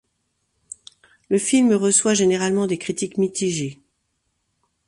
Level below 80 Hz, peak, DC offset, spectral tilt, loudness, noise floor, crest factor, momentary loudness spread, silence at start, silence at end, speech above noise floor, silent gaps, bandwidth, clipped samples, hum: -62 dBFS; -4 dBFS; under 0.1%; -4 dB/octave; -19 LUFS; -72 dBFS; 18 dB; 23 LU; 1.3 s; 1.15 s; 53 dB; none; 11.5 kHz; under 0.1%; none